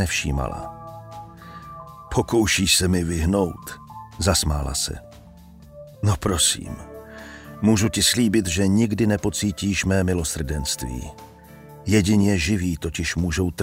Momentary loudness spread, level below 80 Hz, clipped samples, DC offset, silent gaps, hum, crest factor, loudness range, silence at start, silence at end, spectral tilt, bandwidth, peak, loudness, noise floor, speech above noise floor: 21 LU; -36 dBFS; under 0.1%; under 0.1%; none; none; 18 dB; 4 LU; 0 s; 0 s; -4 dB/octave; 16 kHz; -4 dBFS; -21 LUFS; -45 dBFS; 24 dB